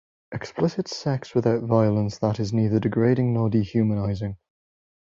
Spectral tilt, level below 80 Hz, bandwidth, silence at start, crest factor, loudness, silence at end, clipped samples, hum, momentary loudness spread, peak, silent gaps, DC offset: -8 dB/octave; -50 dBFS; 7.6 kHz; 0.3 s; 18 dB; -24 LUFS; 0.8 s; under 0.1%; none; 12 LU; -6 dBFS; none; under 0.1%